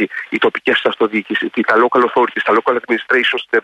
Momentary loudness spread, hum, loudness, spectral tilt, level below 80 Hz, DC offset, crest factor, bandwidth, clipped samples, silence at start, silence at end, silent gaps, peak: 5 LU; none; -15 LUFS; -5 dB/octave; -64 dBFS; under 0.1%; 14 dB; 9.4 kHz; under 0.1%; 0 s; 0.05 s; none; -2 dBFS